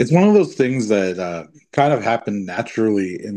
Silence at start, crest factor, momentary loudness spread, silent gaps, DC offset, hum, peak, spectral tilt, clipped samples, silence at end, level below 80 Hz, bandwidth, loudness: 0 s; 16 dB; 12 LU; none; under 0.1%; none; -2 dBFS; -7 dB/octave; under 0.1%; 0 s; -62 dBFS; 9.8 kHz; -18 LUFS